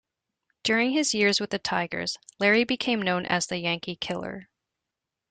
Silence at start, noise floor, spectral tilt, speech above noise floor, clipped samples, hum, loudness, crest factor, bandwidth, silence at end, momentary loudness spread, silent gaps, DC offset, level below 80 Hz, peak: 0.65 s; -86 dBFS; -3.5 dB/octave; 60 dB; under 0.1%; none; -25 LUFS; 20 dB; 9.6 kHz; 0.9 s; 10 LU; none; under 0.1%; -64 dBFS; -8 dBFS